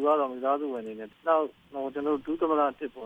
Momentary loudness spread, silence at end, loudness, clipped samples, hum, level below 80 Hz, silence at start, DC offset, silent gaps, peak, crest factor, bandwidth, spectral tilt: 10 LU; 0 s; -29 LUFS; under 0.1%; none; -68 dBFS; 0 s; under 0.1%; none; -12 dBFS; 18 dB; 3.9 kHz; -7 dB/octave